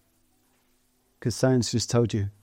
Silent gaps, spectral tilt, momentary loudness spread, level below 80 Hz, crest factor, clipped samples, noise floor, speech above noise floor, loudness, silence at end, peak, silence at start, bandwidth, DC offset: none; -5.5 dB/octave; 8 LU; -60 dBFS; 18 dB; under 0.1%; -68 dBFS; 43 dB; -25 LUFS; 0.1 s; -10 dBFS; 1.2 s; 16 kHz; under 0.1%